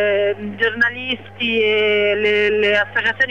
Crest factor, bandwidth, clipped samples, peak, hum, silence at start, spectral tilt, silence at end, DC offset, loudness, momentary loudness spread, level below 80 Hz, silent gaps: 12 dB; 7.2 kHz; under 0.1%; -6 dBFS; none; 0 s; -5 dB/octave; 0 s; 0.5%; -17 LUFS; 6 LU; -58 dBFS; none